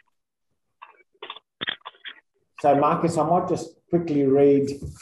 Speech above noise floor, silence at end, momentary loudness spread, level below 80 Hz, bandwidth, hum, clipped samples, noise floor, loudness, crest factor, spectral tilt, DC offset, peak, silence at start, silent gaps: 59 dB; 0.1 s; 22 LU; -56 dBFS; 11.5 kHz; none; under 0.1%; -80 dBFS; -22 LUFS; 16 dB; -6.5 dB/octave; under 0.1%; -8 dBFS; 1.2 s; none